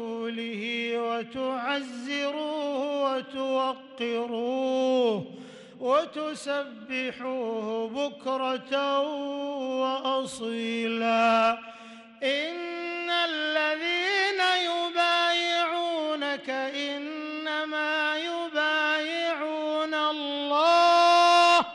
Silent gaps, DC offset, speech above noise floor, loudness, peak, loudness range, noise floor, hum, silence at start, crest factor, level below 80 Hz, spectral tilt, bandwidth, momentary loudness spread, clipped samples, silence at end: none; under 0.1%; 19 dB; -26 LUFS; -12 dBFS; 5 LU; -47 dBFS; none; 0 s; 14 dB; -76 dBFS; -3 dB/octave; 11.5 kHz; 11 LU; under 0.1%; 0 s